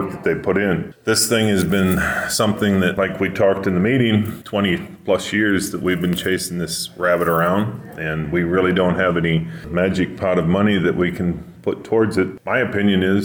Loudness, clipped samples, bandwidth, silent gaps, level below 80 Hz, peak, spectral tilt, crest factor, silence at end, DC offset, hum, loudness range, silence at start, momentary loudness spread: -19 LUFS; under 0.1%; over 20 kHz; none; -44 dBFS; -6 dBFS; -5 dB/octave; 12 dB; 0 s; under 0.1%; none; 2 LU; 0 s; 7 LU